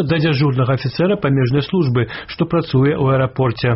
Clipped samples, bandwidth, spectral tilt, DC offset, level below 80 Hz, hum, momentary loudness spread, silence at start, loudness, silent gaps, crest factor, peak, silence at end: under 0.1%; 5.8 kHz; -6.5 dB/octave; under 0.1%; -44 dBFS; none; 4 LU; 0 s; -17 LUFS; none; 10 dB; -6 dBFS; 0 s